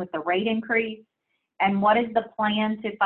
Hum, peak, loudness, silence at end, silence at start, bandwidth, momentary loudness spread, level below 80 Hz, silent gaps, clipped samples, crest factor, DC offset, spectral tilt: none; -8 dBFS; -24 LUFS; 0 s; 0 s; 4.2 kHz; 7 LU; -64 dBFS; none; under 0.1%; 16 dB; under 0.1%; -9 dB/octave